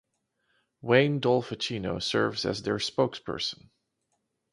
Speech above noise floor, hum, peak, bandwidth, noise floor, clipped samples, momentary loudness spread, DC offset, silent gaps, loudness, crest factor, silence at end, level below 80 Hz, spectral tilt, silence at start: 51 dB; none; -8 dBFS; 11.5 kHz; -78 dBFS; under 0.1%; 9 LU; under 0.1%; none; -28 LUFS; 22 dB; 1 s; -60 dBFS; -5 dB/octave; 0.85 s